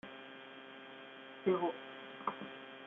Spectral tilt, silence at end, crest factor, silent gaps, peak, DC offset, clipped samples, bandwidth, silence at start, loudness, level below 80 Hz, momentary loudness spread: -4 dB/octave; 0 s; 22 dB; none; -20 dBFS; under 0.1%; under 0.1%; 3.9 kHz; 0.05 s; -42 LUFS; -86 dBFS; 16 LU